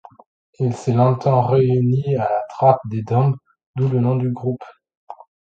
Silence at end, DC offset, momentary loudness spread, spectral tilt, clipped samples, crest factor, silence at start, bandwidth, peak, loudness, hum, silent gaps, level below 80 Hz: 0.4 s; under 0.1%; 9 LU; -9.5 dB/octave; under 0.1%; 18 dB; 0.6 s; 7.6 kHz; 0 dBFS; -19 LUFS; none; 3.66-3.74 s, 4.97-5.07 s; -54 dBFS